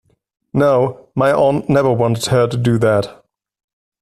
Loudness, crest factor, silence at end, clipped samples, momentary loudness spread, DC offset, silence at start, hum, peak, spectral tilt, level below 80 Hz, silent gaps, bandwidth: -15 LUFS; 14 dB; 0.9 s; under 0.1%; 6 LU; under 0.1%; 0.55 s; none; -2 dBFS; -6.5 dB/octave; -48 dBFS; none; 14 kHz